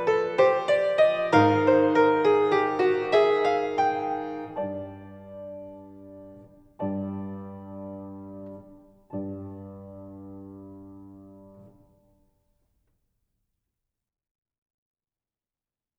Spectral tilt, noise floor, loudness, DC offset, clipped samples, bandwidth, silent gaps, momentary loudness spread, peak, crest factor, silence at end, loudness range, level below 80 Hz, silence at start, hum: -6.5 dB/octave; under -90 dBFS; -23 LUFS; under 0.1%; under 0.1%; 8.6 kHz; none; 24 LU; -8 dBFS; 20 dB; 4.35 s; 20 LU; -66 dBFS; 0 s; none